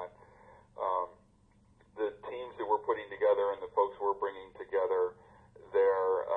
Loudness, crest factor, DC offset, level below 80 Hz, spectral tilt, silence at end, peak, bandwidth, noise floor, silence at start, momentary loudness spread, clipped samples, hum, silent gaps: -33 LUFS; 18 dB; under 0.1%; -70 dBFS; -6.5 dB/octave; 0 s; -16 dBFS; 4.1 kHz; -65 dBFS; 0 s; 14 LU; under 0.1%; none; none